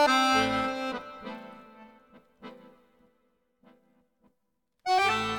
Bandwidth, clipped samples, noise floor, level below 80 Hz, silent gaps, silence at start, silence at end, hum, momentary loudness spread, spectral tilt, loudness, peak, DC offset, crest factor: 19 kHz; under 0.1%; -80 dBFS; -62 dBFS; none; 0 s; 0 s; none; 26 LU; -3 dB/octave; -26 LUFS; -12 dBFS; under 0.1%; 20 dB